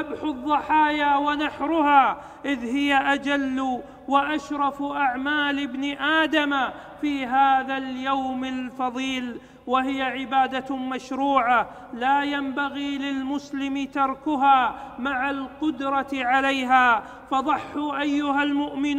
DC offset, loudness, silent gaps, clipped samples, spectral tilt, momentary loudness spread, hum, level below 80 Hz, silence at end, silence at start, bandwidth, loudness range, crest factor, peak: under 0.1%; -23 LUFS; none; under 0.1%; -4 dB/octave; 10 LU; none; -56 dBFS; 0 s; 0 s; 11 kHz; 3 LU; 20 dB; -4 dBFS